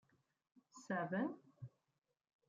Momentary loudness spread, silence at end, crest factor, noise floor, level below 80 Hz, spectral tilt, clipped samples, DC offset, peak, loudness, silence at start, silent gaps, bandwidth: 20 LU; 0.8 s; 18 dB; -88 dBFS; under -90 dBFS; -7 dB/octave; under 0.1%; under 0.1%; -30 dBFS; -43 LUFS; 0.75 s; none; 7.6 kHz